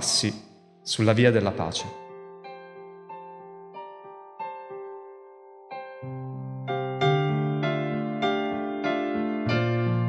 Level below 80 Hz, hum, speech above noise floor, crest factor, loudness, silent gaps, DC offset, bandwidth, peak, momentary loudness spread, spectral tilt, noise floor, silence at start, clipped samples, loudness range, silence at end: -66 dBFS; none; 26 dB; 22 dB; -26 LUFS; none; under 0.1%; 12 kHz; -6 dBFS; 21 LU; -5 dB/octave; -49 dBFS; 0 s; under 0.1%; 15 LU; 0 s